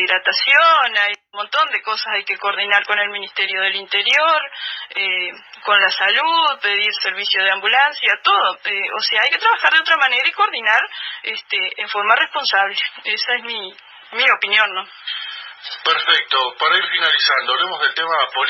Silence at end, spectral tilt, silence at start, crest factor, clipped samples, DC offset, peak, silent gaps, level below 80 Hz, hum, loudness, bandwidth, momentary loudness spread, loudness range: 0 s; -0.5 dB/octave; 0 s; 18 dB; under 0.1%; under 0.1%; 0 dBFS; none; -78 dBFS; none; -16 LUFS; 7.6 kHz; 12 LU; 3 LU